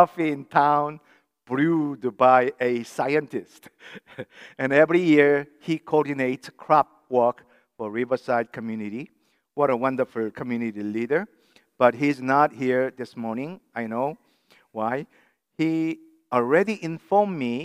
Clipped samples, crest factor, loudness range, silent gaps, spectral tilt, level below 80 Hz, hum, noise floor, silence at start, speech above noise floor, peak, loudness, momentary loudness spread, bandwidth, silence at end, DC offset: under 0.1%; 22 dB; 6 LU; none; -7 dB/octave; -76 dBFS; none; -60 dBFS; 0 s; 37 dB; -2 dBFS; -23 LUFS; 17 LU; 14.5 kHz; 0 s; under 0.1%